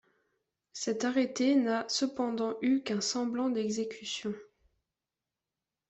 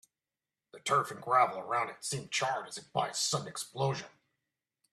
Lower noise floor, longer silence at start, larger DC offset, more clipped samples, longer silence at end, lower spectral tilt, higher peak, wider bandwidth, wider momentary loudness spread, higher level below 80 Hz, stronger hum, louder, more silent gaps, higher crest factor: about the same, under -90 dBFS vs under -90 dBFS; about the same, 0.75 s vs 0.75 s; neither; neither; first, 1.45 s vs 0.85 s; about the same, -3.5 dB/octave vs -3 dB/octave; second, -18 dBFS vs -12 dBFS; second, 8.2 kHz vs 14.5 kHz; about the same, 10 LU vs 11 LU; about the same, -76 dBFS vs -76 dBFS; neither; about the same, -31 LUFS vs -33 LUFS; neither; second, 16 dB vs 22 dB